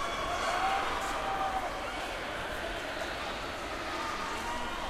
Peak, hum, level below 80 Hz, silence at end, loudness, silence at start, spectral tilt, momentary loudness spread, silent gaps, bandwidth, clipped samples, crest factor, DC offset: -18 dBFS; none; -48 dBFS; 0 s; -34 LUFS; 0 s; -3 dB/octave; 6 LU; none; 16 kHz; under 0.1%; 16 dB; under 0.1%